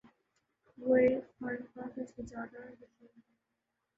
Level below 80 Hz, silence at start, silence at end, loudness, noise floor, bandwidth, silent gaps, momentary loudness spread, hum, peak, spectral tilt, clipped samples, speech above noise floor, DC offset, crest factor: -68 dBFS; 0.8 s; 1.2 s; -34 LUFS; -85 dBFS; 7.6 kHz; none; 19 LU; none; -16 dBFS; -7.5 dB/octave; under 0.1%; 50 dB; under 0.1%; 20 dB